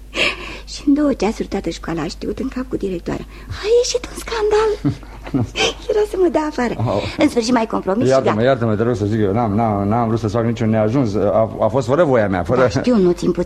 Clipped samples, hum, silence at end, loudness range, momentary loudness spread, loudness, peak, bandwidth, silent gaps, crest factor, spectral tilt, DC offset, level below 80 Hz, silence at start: under 0.1%; none; 0 s; 4 LU; 9 LU; -18 LUFS; -2 dBFS; 13.5 kHz; none; 16 dB; -6 dB/octave; under 0.1%; -38 dBFS; 0 s